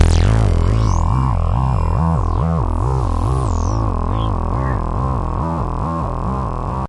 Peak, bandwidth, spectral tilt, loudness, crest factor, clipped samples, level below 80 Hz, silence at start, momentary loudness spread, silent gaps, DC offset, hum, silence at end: -2 dBFS; 11 kHz; -7.5 dB/octave; -18 LUFS; 14 dB; under 0.1%; -20 dBFS; 0 s; 6 LU; none; under 0.1%; none; 0 s